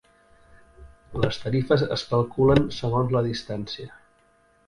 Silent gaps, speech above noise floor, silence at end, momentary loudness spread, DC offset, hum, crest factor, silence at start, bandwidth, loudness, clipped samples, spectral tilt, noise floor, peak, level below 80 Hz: none; 38 dB; 0.75 s; 15 LU; under 0.1%; none; 22 dB; 0.8 s; 11 kHz; -24 LUFS; under 0.1%; -7 dB/octave; -61 dBFS; -2 dBFS; -46 dBFS